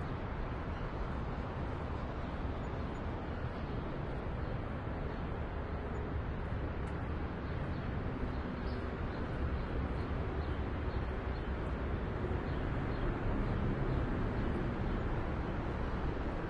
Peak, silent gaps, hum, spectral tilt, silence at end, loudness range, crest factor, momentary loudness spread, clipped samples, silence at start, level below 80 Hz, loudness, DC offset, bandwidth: -24 dBFS; none; none; -8.5 dB/octave; 0 s; 3 LU; 14 dB; 4 LU; under 0.1%; 0 s; -42 dBFS; -39 LUFS; under 0.1%; 7.2 kHz